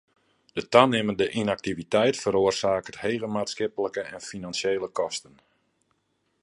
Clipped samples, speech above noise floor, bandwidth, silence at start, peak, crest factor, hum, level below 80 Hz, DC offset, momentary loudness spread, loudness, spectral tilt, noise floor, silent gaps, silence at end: under 0.1%; 48 dB; 11.5 kHz; 0.55 s; -2 dBFS; 26 dB; none; -60 dBFS; under 0.1%; 13 LU; -26 LUFS; -4.5 dB/octave; -73 dBFS; none; 1.25 s